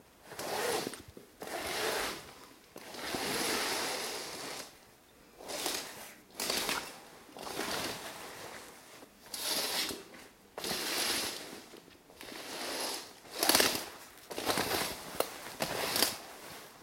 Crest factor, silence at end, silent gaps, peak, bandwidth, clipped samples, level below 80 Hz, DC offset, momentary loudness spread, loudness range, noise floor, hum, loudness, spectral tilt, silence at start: 30 dB; 0 s; none; -8 dBFS; 16.5 kHz; under 0.1%; -66 dBFS; under 0.1%; 19 LU; 6 LU; -60 dBFS; none; -34 LUFS; -1 dB/octave; 0 s